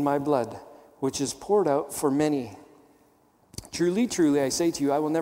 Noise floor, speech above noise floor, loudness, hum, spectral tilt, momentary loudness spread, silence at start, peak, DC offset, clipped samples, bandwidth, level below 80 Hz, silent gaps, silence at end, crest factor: -62 dBFS; 37 dB; -26 LUFS; none; -5 dB/octave; 14 LU; 0 s; -10 dBFS; under 0.1%; under 0.1%; 16.5 kHz; -60 dBFS; none; 0 s; 16 dB